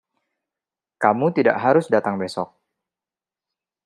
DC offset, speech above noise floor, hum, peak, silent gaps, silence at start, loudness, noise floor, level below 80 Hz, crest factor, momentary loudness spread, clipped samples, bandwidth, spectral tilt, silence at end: under 0.1%; over 71 dB; none; -2 dBFS; none; 1 s; -20 LUFS; under -90 dBFS; -72 dBFS; 22 dB; 11 LU; under 0.1%; 11.5 kHz; -7 dB/octave; 1.4 s